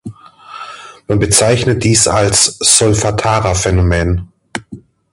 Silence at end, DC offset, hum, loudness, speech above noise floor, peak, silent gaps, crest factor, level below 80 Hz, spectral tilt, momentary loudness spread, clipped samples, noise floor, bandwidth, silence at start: 0.35 s; under 0.1%; none; -11 LUFS; 24 dB; 0 dBFS; none; 14 dB; -28 dBFS; -3.5 dB/octave; 20 LU; under 0.1%; -35 dBFS; 16 kHz; 0.05 s